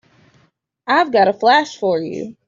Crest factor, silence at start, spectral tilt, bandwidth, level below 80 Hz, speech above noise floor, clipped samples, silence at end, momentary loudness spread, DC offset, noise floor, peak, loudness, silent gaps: 16 dB; 0.85 s; -4.5 dB/octave; 7.6 kHz; -64 dBFS; 44 dB; under 0.1%; 0.15 s; 11 LU; under 0.1%; -60 dBFS; -2 dBFS; -16 LUFS; none